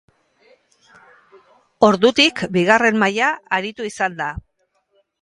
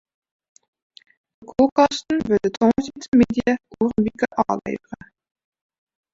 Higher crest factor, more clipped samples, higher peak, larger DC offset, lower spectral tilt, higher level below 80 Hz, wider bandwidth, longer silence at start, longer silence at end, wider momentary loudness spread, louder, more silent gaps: about the same, 20 dB vs 20 dB; neither; about the same, 0 dBFS vs -2 dBFS; neither; second, -4 dB/octave vs -6 dB/octave; about the same, -50 dBFS vs -50 dBFS; first, 11.5 kHz vs 7.8 kHz; first, 1.8 s vs 1.4 s; second, 0.85 s vs 1.2 s; about the same, 13 LU vs 12 LU; first, -17 LUFS vs -20 LUFS; second, none vs 1.72-1.76 s, 3.08-3.12 s